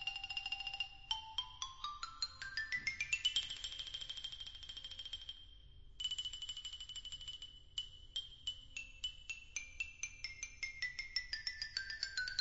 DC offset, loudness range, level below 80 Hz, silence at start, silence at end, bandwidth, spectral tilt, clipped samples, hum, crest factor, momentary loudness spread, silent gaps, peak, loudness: under 0.1%; 5 LU; -62 dBFS; 0 s; 0 s; 7.6 kHz; 3 dB/octave; under 0.1%; none; 24 dB; 9 LU; none; -22 dBFS; -43 LUFS